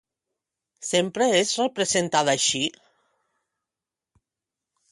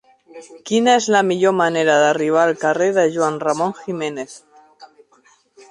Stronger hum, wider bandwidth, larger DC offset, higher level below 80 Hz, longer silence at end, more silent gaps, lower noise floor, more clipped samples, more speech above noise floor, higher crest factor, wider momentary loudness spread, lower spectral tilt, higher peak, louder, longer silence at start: neither; about the same, 11.5 kHz vs 11.5 kHz; neither; about the same, -68 dBFS vs -66 dBFS; first, 2.2 s vs 0.85 s; neither; first, -89 dBFS vs -55 dBFS; neither; first, 66 dB vs 38 dB; about the same, 20 dB vs 16 dB; second, 6 LU vs 11 LU; second, -2.5 dB/octave vs -4 dB/octave; second, -6 dBFS vs -2 dBFS; second, -22 LUFS vs -17 LUFS; first, 0.8 s vs 0.35 s